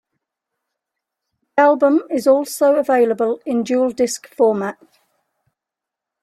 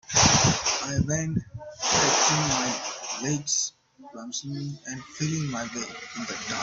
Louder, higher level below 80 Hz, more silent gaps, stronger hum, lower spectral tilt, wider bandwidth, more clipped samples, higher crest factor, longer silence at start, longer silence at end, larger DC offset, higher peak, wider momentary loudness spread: first, -17 LUFS vs -25 LUFS; second, -68 dBFS vs -50 dBFS; neither; neither; first, -4.5 dB/octave vs -2.5 dB/octave; first, 15 kHz vs 8.2 kHz; neither; second, 16 dB vs 22 dB; first, 1.55 s vs 0.1 s; first, 1.5 s vs 0 s; neither; first, -2 dBFS vs -6 dBFS; second, 7 LU vs 16 LU